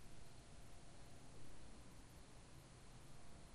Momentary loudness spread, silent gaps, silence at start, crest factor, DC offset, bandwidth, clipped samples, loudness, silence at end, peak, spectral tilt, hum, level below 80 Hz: 1 LU; none; 0 s; 12 dB; under 0.1%; 13 kHz; under 0.1%; -63 LUFS; 0 s; -42 dBFS; -4.5 dB/octave; none; -66 dBFS